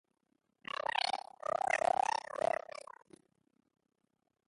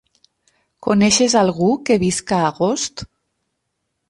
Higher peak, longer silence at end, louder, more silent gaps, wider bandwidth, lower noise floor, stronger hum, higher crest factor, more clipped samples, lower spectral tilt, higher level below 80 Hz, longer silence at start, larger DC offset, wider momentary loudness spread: second, -18 dBFS vs -2 dBFS; first, 2.1 s vs 1.05 s; second, -35 LUFS vs -17 LUFS; neither; about the same, 11.5 kHz vs 11.5 kHz; first, -80 dBFS vs -74 dBFS; neither; about the same, 20 dB vs 16 dB; neither; second, -1.5 dB/octave vs -4 dB/octave; second, -80 dBFS vs -52 dBFS; first, 0.95 s vs 0.8 s; neither; first, 18 LU vs 11 LU